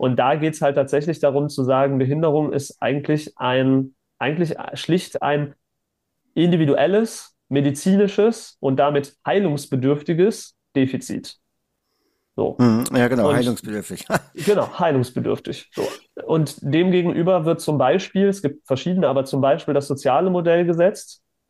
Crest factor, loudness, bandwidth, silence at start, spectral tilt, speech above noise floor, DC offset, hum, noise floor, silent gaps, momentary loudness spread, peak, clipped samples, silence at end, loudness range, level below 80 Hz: 14 dB; -20 LUFS; 15.5 kHz; 0 s; -6.5 dB/octave; 57 dB; under 0.1%; none; -77 dBFS; none; 10 LU; -6 dBFS; under 0.1%; 0.35 s; 3 LU; -60 dBFS